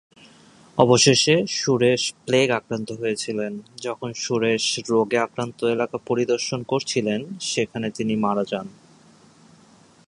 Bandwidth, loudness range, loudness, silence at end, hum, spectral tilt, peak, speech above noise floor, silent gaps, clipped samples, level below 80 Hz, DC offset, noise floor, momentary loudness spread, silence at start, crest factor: 11.5 kHz; 6 LU; -22 LUFS; 1.35 s; none; -4 dB/octave; 0 dBFS; 31 dB; none; under 0.1%; -62 dBFS; under 0.1%; -53 dBFS; 12 LU; 0.75 s; 22 dB